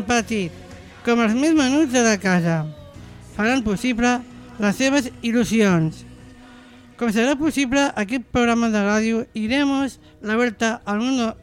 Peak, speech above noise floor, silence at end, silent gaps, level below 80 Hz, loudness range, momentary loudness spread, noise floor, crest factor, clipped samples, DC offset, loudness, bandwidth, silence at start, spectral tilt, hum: -4 dBFS; 25 dB; 0.1 s; none; -46 dBFS; 2 LU; 10 LU; -45 dBFS; 16 dB; under 0.1%; under 0.1%; -20 LUFS; 16 kHz; 0 s; -5 dB/octave; none